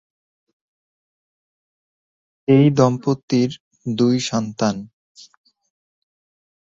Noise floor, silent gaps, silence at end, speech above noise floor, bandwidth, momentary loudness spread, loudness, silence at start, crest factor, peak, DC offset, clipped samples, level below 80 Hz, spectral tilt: under -90 dBFS; 3.23-3.28 s, 3.60-3.71 s; 1.9 s; over 73 dB; 7.8 kHz; 14 LU; -19 LUFS; 2.5 s; 20 dB; -2 dBFS; under 0.1%; under 0.1%; -60 dBFS; -6.5 dB/octave